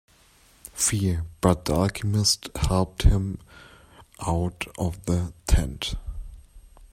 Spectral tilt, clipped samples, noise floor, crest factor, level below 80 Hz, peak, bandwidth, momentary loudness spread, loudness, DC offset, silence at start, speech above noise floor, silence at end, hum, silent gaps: -4.5 dB/octave; under 0.1%; -57 dBFS; 22 dB; -32 dBFS; -4 dBFS; 16 kHz; 14 LU; -25 LUFS; under 0.1%; 0.65 s; 33 dB; 0.05 s; none; none